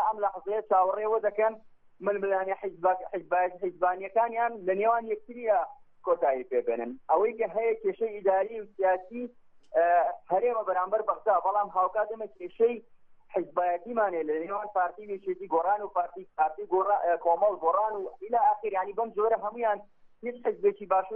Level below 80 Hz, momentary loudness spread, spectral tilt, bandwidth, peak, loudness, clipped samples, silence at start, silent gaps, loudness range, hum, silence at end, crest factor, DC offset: -70 dBFS; 9 LU; -4.5 dB/octave; 3.5 kHz; -12 dBFS; -29 LUFS; under 0.1%; 0 s; none; 3 LU; none; 0 s; 16 dB; under 0.1%